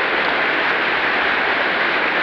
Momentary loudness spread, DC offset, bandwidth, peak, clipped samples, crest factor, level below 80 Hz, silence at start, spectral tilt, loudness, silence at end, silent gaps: 0 LU; under 0.1%; 9.4 kHz; -6 dBFS; under 0.1%; 12 dB; -54 dBFS; 0 s; -4 dB/octave; -17 LUFS; 0 s; none